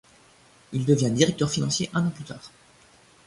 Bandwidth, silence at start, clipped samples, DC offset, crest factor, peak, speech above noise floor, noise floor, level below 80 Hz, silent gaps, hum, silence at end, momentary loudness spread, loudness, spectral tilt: 11.5 kHz; 0.7 s; under 0.1%; under 0.1%; 22 dB; -4 dBFS; 32 dB; -56 dBFS; -58 dBFS; none; none; 0.8 s; 17 LU; -24 LUFS; -5 dB/octave